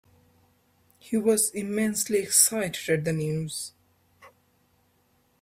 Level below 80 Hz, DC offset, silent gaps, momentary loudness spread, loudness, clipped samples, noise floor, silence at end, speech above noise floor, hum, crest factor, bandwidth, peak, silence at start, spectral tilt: -66 dBFS; under 0.1%; none; 12 LU; -24 LUFS; under 0.1%; -67 dBFS; 1.15 s; 41 dB; none; 26 dB; 16 kHz; -2 dBFS; 1.05 s; -3.5 dB/octave